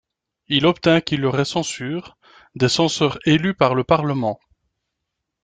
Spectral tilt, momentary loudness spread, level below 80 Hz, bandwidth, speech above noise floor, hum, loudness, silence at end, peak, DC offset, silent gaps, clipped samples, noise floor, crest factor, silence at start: -5 dB/octave; 10 LU; -52 dBFS; 9.4 kHz; 61 dB; none; -19 LUFS; 1.1 s; -2 dBFS; under 0.1%; none; under 0.1%; -80 dBFS; 18 dB; 0.5 s